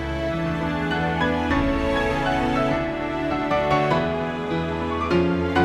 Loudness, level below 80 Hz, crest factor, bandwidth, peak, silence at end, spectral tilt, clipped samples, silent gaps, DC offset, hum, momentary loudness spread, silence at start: -23 LUFS; -36 dBFS; 16 dB; 13 kHz; -6 dBFS; 0 s; -7 dB/octave; under 0.1%; none; under 0.1%; none; 5 LU; 0 s